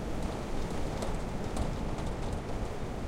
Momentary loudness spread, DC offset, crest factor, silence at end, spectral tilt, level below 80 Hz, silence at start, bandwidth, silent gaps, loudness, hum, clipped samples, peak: 2 LU; under 0.1%; 14 dB; 0 s; -6 dB/octave; -38 dBFS; 0 s; 15.5 kHz; none; -37 LUFS; none; under 0.1%; -20 dBFS